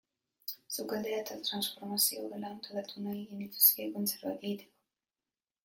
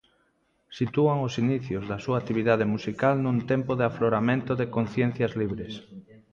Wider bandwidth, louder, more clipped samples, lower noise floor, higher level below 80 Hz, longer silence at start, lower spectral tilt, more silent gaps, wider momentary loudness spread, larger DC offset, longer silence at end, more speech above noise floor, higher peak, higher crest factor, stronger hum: first, 16.5 kHz vs 7.4 kHz; second, -32 LUFS vs -26 LUFS; neither; first, under -90 dBFS vs -69 dBFS; second, -82 dBFS vs -56 dBFS; second, 0.45 s vs 0.7 s; second, -2.5 dB/octave vs -8 dB/octave; neither; first, 18 LU vs 8 LU; neither; first, 1 s vs 0.15 s; first, over 55 dB vs 43 dB; about the same, -10 dBFS vs -8 dBFS; first, 26 dB vs 18 dB; neither